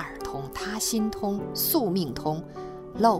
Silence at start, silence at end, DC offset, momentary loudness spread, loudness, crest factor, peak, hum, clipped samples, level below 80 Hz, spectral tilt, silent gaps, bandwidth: 0 s; 0 s; under 0.1%; 12 LU; -28 LUFS; 20 dB; -8 dBFS; none; under 0.1%; -50 dBFS; -4.5 dB/octave; none; 16 kHz